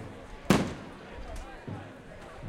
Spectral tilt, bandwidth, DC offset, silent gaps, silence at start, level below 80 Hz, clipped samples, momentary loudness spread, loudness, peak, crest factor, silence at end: -5.5 dB/octave; 16 kHz; under 0.1%; none; 0 s; -48 dBFS; under 0.1%; 19 LU; -33 LUFS; -8 dBFS; 26 dB; 0 s